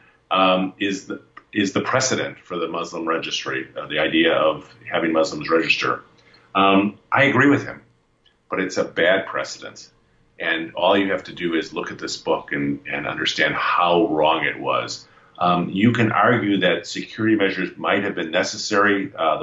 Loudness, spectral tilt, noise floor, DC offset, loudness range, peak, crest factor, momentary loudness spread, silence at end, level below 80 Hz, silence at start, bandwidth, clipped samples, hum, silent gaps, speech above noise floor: -20 LUFS; -4.5 dB/octave; -61 dBFS; under 0.1%; 4 LU; -4 dBFS; 16 dB; 11 LU; 0 s; -60 dBFS; 0.3 s; 8 kHz; under 0.1%; none; none; 41 dB